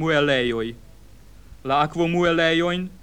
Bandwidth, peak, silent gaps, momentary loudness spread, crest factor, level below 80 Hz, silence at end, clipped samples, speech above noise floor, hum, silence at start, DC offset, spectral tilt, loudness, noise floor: 10.5 kHz; -6 dBFS; none; 10 LU; 16 dB; -48 dBFS; 0.05 s; under 0.1%; 26 dB; none; 0 s; 0.4%; -5.5 dB/octave; -21 LUFS; -48 dBFS